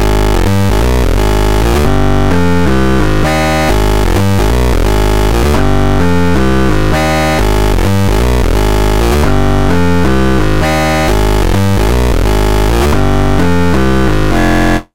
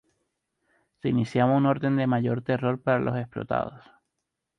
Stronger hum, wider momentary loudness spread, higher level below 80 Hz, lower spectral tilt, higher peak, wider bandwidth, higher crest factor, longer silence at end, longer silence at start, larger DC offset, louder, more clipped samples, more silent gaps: neither; second, 1 LU vs 8 LU; first, -14 dBFS vs -60 dBFS; second, -6 dB/octave vs -8.5 dB/octave; first, 0 dBFS vs -10 dBFS; first, 16.5 kHz vs 8.6 kHz; second, 10 dB vs 16 dB; second, 0 s vs 0.8 s; second, 0 s vs 1.05 s; first, 10% vs under 0.1%; first, -11 LUFS vs -26 LUFS; neither; neither